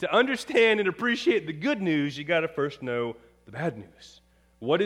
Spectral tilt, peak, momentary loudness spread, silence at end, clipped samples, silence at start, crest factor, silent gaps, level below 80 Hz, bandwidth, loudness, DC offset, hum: -5.5 dB/octave; -8 dBFS; 13 LU; 0 s; under 0.1%; 0 s; 18 dB; none; -64 dBFS; 13 kHz; -26 LUFS; under 0.1%; none